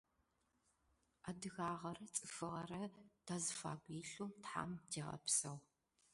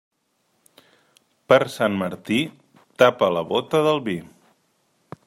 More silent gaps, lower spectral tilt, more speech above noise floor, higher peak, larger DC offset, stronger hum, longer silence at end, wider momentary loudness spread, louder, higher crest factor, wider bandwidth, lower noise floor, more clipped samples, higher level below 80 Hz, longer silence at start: neither; second, -3 dB/octave vs -5.5 dB/octave; second, 36 dB vs 49 dB; second, -24 dBFS vs -2 dBFS; neither; neither; second, 0.5 s vs 1.05 s; first, 13 LU vs 10 LU; second, -46 LUFS vs -21 LUFS; about the same, 24 dB vs 22 dB; second, 11.5 kHz vs 16 kHz; first, -83 dBFS vs -69 dBFS; neither; second, -78 dBFS vs -66 dBFS; second, 1.25 s vs 1.5 s